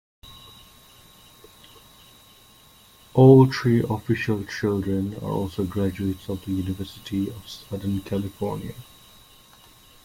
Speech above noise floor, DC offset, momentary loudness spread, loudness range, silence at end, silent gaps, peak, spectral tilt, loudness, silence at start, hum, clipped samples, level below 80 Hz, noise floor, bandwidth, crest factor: 30 dB; under 0.1%; 19 LU; 10 LU; 1.2 s; none; -4 dBFS; -8 dB/octave; -23 LUFS; 0.25 s; none; under 0.1%; -54 dBFS; -53 dBFS; 16.5 kHz; 22 dB